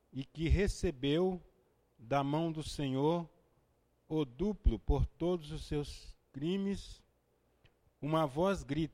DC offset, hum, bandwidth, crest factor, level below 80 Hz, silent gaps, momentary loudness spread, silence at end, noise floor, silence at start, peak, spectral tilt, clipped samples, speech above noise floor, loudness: under 0.1%; none; 15 kHz; 18 dB; -42 dBFS; none; 12 LU; 0 s; -74 dBFS; 0.15 s; -18 dBFS; -7 dB/octave; under 0.1%; 40 dB; -36 LUFS